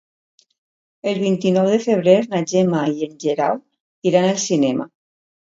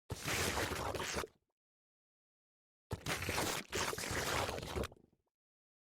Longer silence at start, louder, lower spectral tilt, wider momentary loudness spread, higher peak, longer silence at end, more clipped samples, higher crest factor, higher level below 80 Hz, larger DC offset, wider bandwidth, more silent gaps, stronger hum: first, 1.05 s vs 0.1 s; first, -19 LUFS vs -39 LUFS; first, -5.5 dB/octave vs -3 dB/octave; about the same, 9 LU vs 8 LU; first, 0 dBFS vs -22 dBFS; second, 0.6 s vs 0.95 s; neither; about the same, 18 dB vs 20 dB; second, -66 dBFS vs -56 dBFS; neither; second, 7.8 kHz vs over 20 kHz; second, 3.80-4.02 s vs 1.52-2.90 s; neither